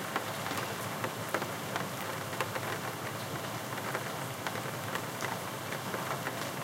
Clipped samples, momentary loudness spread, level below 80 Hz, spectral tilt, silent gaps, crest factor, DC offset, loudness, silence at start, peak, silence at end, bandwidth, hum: under 0.1%; 2 LU; -74 dBFS; -3.5 dB/octave; none; 22 dB; under 0.1%; -36 LUFS; 0 s; -14 dBFS; 0 s; 17 kHz; none